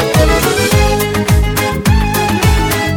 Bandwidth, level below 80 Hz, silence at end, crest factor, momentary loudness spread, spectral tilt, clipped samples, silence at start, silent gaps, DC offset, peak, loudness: 20 kHz; -18 dBFS; 0 s; 12 dB; 3 LU; -5 dB/octave; under 0.1%; 0 s; none; under 0.1%; 0 dBFS; -12 LUFS